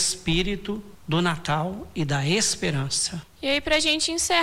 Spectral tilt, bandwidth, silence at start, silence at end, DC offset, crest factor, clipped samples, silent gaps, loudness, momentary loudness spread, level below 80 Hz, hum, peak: -3 dB/octave; 16.5 kHz; 0 s; 0 s; under 0.1%; 16 dB; under 0.1%; none; -24 LUFS; 10 LU; -42 dBFS; none; -10 dBFS